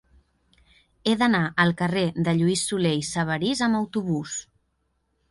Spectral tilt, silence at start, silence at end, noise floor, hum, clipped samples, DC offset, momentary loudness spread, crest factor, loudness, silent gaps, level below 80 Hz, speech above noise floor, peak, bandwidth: -5 dB/octave; 1.05 s; 0.9 s; -72 dBFS; none; under 0.1%; under 0.1%; 7 LU; 18 dB; -24 LUFS; none; -56 dBFS; 49 dB; -6 dBFS; 11.5 kHz